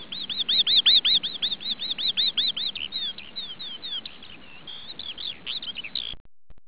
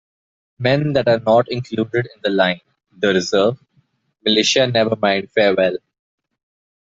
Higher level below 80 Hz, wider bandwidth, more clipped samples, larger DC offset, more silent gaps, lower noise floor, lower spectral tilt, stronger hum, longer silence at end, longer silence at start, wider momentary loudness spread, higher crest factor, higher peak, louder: about the same, -60 dBFS vs -58 dBFS; second, 4 kHz vs 8 kHz; neither; first, 0.7% vs under 0.1%; first, 6.20-6.25 s vs none; second, -46 dBFS vs -61 dBFS; second, 2 dB/octave vs -4.5 dB/octave; neither; second, 0.1 s vs 1.05 s; second, 0 s vs 0.6 s; first, 20 LU vs 8 LU; about the same, 16 dB vs 16 dB; second, -8 dBFS vs -2 dBFS; second, -21 LUFS vs -17 LUFS